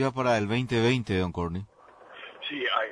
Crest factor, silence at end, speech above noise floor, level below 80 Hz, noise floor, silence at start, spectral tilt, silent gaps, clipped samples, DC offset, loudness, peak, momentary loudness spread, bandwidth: 16 dB; 0 s; 24 dB; -54 dBFS; -51 dBFS; 0 s; -6 dB/octave; none; under 0.1%; under 0.1%; -27 LUFS; -12 dBFS; 18 LU; 10.5 kHz